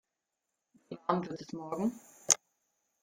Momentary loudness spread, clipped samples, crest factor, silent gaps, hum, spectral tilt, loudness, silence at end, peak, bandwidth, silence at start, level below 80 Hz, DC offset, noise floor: 16 LU; under 0.1%; 34 dB; none; none; -3 dB/octave; -33 LUFS; 0.65 s; -4 dBFS; 16.5 kHz; 0.9 s; -76 dBFS; under 0.1%; -87 dBFS